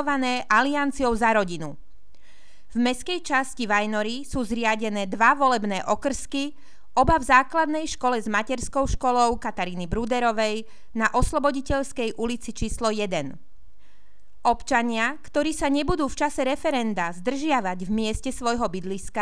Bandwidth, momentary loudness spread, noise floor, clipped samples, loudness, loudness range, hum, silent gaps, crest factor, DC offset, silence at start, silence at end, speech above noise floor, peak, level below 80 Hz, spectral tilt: 11 kHz; 9 LU; -61 dBFS; under 0.1%; -24 LUFS; 5 LU; none; none; 20 dB; 2%; 0 s; 0 s; 37 dB; -4 dBFS; -40 dBFS; -4 dB/octave